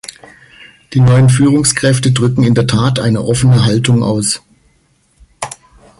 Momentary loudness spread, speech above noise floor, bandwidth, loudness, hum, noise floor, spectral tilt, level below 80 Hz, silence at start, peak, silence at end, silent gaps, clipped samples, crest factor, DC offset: 16 LU; 45 dB; 11.5 kHz; -11 LUFS; none; -55 dBFS; -5.5 dB/octave; -40 dBFS; 0.6 s; 0 dBFS; 0.5 s; none; under 0.1%; 12 dB; under 0.1%